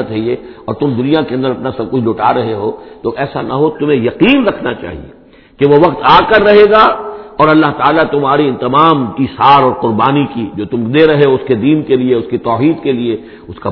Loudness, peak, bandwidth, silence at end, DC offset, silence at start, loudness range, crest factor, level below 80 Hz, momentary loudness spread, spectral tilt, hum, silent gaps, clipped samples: -11 LUFS; 0 dBFS; 5.4 kHz; 0 s; under 0.1%; 0 s; 6 LU; 10 dB; -42 dBFS; 13 LU; -9 dB/octave; none; none; 0.6%